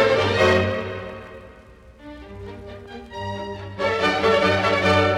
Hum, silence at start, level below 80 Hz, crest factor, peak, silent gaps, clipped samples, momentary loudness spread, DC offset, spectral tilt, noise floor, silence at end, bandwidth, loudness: none; 0 s; -48 dBFS; 16 dB; -6 dBFS; none; under 0.1%; 21 LU; under 0.1%; -5.5 dB/octave; -46 dBFS; 0 s; 13 kHz; -20 LUFS